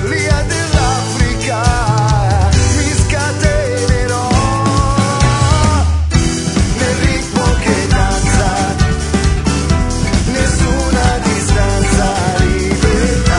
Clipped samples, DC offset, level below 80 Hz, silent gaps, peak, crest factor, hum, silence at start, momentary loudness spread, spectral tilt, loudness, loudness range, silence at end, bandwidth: under 0.1%; under 0.1%; -18 dBFS; none; 0 dBFS; 12 dB; none; 0 s; 3 LU; -5 dB/octave; -13 LUFS; 1 LU; 0 s; 11 kHz